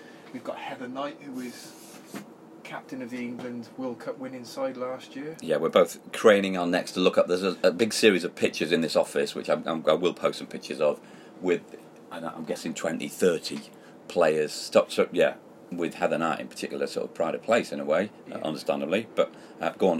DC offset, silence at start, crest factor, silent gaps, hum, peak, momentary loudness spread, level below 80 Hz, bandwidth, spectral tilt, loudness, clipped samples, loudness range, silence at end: under 0.1%; 0 s; 22 dB; none; none; -4 dBFS; 16 LU; -76 dBFS; 16 kHz; -4.5 dB/octave; -27 LUFS; under 0.1%; 13 LU; 0 s